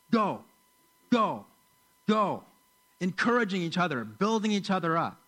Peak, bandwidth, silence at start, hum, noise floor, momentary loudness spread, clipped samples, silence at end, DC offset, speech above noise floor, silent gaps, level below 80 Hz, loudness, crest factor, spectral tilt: -12 dBFS; 15.5 kHz; 0.1 s; none; -65 dBFS; 9 LU; under 0.1%; 0.15 s; under 0.1%; 38 dB; none; -76 dBFS; -29 LUFS; 16 dB; -6 dB/octave